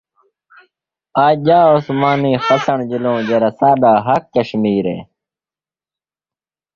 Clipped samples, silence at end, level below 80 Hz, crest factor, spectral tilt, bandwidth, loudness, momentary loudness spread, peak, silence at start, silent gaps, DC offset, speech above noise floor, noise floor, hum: under 0.1%; 1.7 s; -56 dBFS; 14 dB; -7.5 dB/octave; 7.2 kHz; -14 LUFS; 8 LU; -2 dBFS; 1.15 s; none; under 0.1%; over 77 dB; under -90 dBFS; none